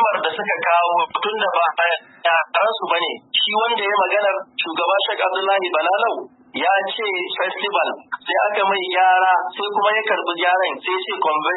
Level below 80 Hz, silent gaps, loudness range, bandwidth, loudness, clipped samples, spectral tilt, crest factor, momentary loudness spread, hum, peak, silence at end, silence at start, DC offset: -80 dBFS; none; 2 LU; 4.1 kHz; -19 LUFS; under 0.1%; -7 dB/octave; 16 dB; 6 LU; none; -4 dBFS; 0 s; 0 s; under 0.1%